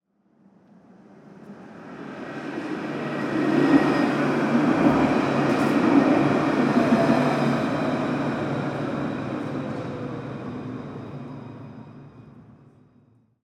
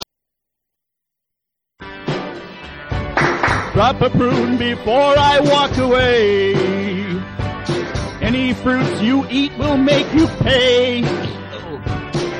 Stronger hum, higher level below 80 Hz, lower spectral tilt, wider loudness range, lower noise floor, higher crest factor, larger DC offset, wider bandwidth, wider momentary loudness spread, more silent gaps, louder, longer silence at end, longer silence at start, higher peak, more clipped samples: neither; second, -56 dBFS vs -36 dBFS; about the same, -7 dB/octave vs -6 dB/octave; first, 15 LU vs 6 LU; second, -60 dBFS vs -81 dBFS; first, 20 dB vs 14 dB; neither; about the same, 11.5 kHz vs 11 kHz; first, 20 LU vs 14 LU; neither; second, -23 LUFS vs -16 LUFS; first, 0.95 s vs 0 s; second, 1.15 s vs 1.8 s; about the same, -4 dBFS vs -2 dBFS; neither